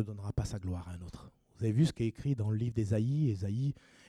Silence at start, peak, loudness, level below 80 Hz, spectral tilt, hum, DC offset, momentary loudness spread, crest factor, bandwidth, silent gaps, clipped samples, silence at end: 0 s; -18 dBFS; -34 LUFS; -52 dBFS; -8 dB/octave; none; under 0.1%; 14 LU; 16 dB; 11.5 kHz; none; under 0.1%; 0.35 s